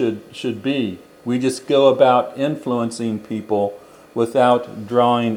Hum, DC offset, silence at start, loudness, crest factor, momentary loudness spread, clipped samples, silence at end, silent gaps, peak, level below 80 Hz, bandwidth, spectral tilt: none; under 0.1%; 0 s; -19 LUFS; 18 dB; 12 LU; under 0.1%; 0 s; none; 0 dBFS; -66 dBFS; 16 kHz; -6 dB/octave